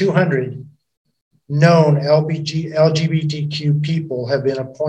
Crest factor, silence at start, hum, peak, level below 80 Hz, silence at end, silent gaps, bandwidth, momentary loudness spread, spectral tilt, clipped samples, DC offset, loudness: 16 dB; 0 s; none; 0 dBFS; -58 dBFS; 0 s; 0.97-1.05 s, 1.22-1.31 s; 8.2 kHz; 9 LU; -7 dB/octave; under 0.1%; under 0.1%; -17 LUFS